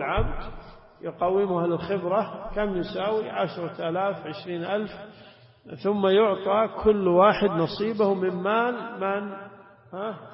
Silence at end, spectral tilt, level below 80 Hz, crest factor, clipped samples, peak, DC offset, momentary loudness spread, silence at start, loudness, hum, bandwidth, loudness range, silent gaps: 0 s; -10.5 dB/octave; -42 dBFS; 18 dB; under 0.1%; -8 dBFS; under 0.1%; 17 LU; 0 s; -25 LUFS; none; 5.8 kHz; 7 LU; none